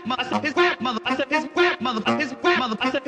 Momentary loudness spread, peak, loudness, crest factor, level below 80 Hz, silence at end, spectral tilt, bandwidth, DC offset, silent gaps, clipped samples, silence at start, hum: 4 LU; -6 dBFS; -22 LUFS; 16 dB; -60 dBFS; 0 s; -4 dB/octave; 9.8 kHz; under 0.1%; none; under 0.1%; 0 s; none